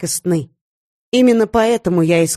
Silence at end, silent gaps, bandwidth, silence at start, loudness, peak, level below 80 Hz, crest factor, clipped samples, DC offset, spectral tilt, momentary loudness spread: 0 s; 0.61-1.12 s; 13 kHz; 0 s; -15 LUFS; -2 dBFS; -46 dBFS; 12 dB; under 0.1%; under 0.1%; -5 dB/octave; 7 LU